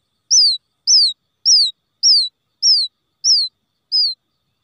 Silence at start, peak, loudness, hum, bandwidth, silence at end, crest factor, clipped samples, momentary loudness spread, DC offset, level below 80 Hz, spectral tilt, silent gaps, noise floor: 0.3 s; -6 dBFS; -13 LUFS; none; 12 kHz; 0.5 s; 12 dB; under 0.1%; 9 LU; under 0.1%; -86 dBFS; 7.5 dB/octave; none; -51 dBFS